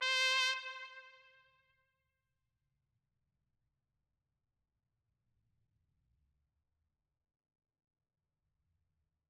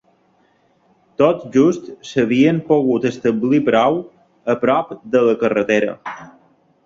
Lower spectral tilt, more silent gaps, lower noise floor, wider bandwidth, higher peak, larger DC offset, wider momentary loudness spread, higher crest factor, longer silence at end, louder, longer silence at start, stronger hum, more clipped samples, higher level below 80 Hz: second, 4 dB/octave vs -6.5 dB/octave; neither; first, -88 dBFS vs -58 dBFS; first, 15.5 kHz vs 7.6 kHz; second, -20 dBFS vs -2 dBFS; neither; first, 22 LU vs 12 LU; first, 26 dB vs 16 dB; first, 8.2 s vs 0.6 s; second, -32 LUFS vs -17 LUFS; second, 0 s vs 1.2 s; neither; neither; second, -90 dBFS vs -58 dBFS